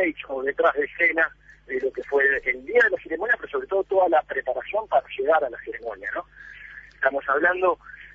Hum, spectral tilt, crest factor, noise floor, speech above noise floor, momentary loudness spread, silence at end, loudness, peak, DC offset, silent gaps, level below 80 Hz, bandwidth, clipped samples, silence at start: none; -5.5 dB/octave; 18 dB; -44 dBFS; 20 dB; 13 LU; 0.1 s; -23 LUFS; -6 dBFS; under 0.1%; none; -56 dBFS; 7.2 kHz; under 0.1%; 0 s